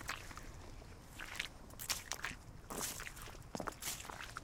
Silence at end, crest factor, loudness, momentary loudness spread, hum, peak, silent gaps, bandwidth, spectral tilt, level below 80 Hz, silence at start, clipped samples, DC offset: 0 s; 30 dB; -45 LUFS; 13 LU; none; -18 dBFS; none; 18 kHz; -2 dB/octave; -58 dBFS; 0 s; under 0.1%; under 0.1%